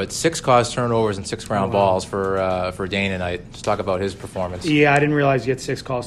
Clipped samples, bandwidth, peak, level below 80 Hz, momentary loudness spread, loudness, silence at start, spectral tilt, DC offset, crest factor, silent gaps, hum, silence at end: under 0.1%; 13 kHz; -2 dBFS; -46 dBFS; 10 LU; -20 LUFS; 0 s; -5 dB/octave; under 0.1%; 18 dB; none; none; 0 s